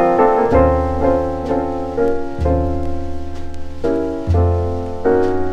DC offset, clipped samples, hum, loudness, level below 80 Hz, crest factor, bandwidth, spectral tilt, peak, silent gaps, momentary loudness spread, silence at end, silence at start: under 0.1%; under 0.1%; none; -17 LUFS; -26 dBFS; 16 dB; 8.2 kHz; -9 dB/octave; 0 dBFS; none; 13 LU; 0 s; 0 s